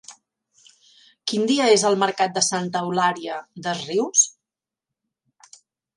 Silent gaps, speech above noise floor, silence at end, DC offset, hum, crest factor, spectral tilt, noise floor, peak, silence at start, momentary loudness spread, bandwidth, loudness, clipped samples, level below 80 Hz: none; 67 dB; 1.7 s; under 0.1%; none; 20 dB; -2.5 dB/octave; -88 dBFS; -4 dBFS; 0.1 s; 13 LU; 11.5 kHz; -21 LUFS; under 0.1%; -74 dBFS